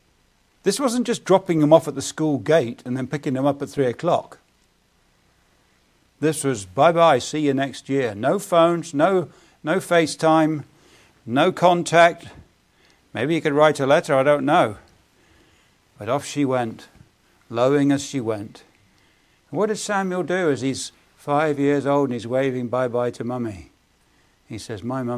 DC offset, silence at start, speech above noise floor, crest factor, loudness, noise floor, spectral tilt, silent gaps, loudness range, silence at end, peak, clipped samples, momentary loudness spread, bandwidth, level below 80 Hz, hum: under 0.1%; 0.65 s; 42 dB; 22 dB; -21 LUFS; -62 dBFS; -5.5 dB/octave; none; 6 LU; 0 s; 0 dBFS; under 0.1%; 14 LU; 15.5 kHz; -60 dBFS; none